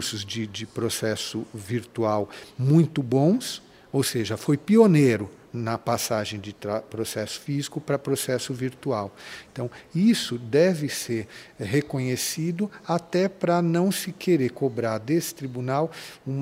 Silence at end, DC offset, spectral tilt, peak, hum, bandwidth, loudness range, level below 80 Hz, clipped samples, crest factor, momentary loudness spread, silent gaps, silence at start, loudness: 0 s; under 0.1%; -5.5 dB/octave; -4 dBFS; none; 16 kHz; 6 LU; -64 dBFS; under 0.1%; 20 dB; 12 LU; none; 0 s; -25 LUFS